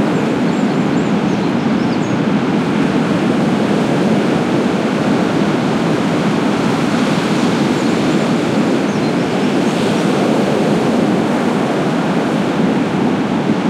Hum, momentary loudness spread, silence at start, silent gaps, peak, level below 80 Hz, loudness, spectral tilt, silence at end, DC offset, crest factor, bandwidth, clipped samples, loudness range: none; 2 LU; 0 s; none; -4 dBFS; -50 dBFS; -15 LUFS; -6.5 dB/octave; 0 s; under 0.1%; 12 dB; 13.5 kHz; under 0.1%; 0 LU